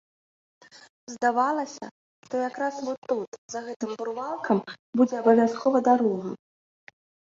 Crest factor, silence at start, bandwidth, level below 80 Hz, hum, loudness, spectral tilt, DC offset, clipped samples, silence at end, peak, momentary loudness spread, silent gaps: 20 dB; 0.75 s; 7.6 kHz; -74 dBFS; none; -26 LUFS; -5.5 dB/octave; under 0.1%; under 0.1%; 0.95 s; -6 dBFS; 15 LU; 0.89-1.07 s, 1.91-2.23 s, 2.98-3.02 s, 3.28-3.32 s, 3.38-3.49 s, 3.76-3.80 s, 4.79-4.93 s